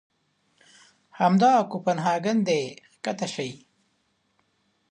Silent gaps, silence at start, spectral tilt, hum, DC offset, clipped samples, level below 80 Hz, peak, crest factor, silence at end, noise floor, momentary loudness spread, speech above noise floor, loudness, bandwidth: none; 1.2 s; -5.5 dB/octave; none; under 0.1%; under 0.1%; -76 dBFS; -8 dBFS; 18 dB; 1.35 s; -71 dBFS; 15 LU; 48 dB; -24 LUFS; 10 kHz